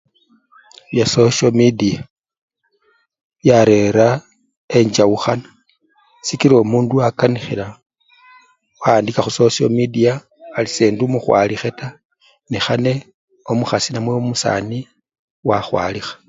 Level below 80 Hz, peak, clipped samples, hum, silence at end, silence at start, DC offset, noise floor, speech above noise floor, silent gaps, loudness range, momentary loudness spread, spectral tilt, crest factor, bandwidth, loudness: -52 dBFS; 0 dBFS; under 0.1%; none; 0.15 s; 0.9 s; under 0.1%; -61 dBFS; 46 dB; 2.10-2.24 s, 2.37-2.48 s, 3.24-3.30 s, 4.57-4.68 s, 12.05-12.10 s, 13.14-13.28 s, 15.19-15.43 s; 4 LU; 13 LU; -5.5 dB/octave; 18 dB; 8 kHz; -16 LUFS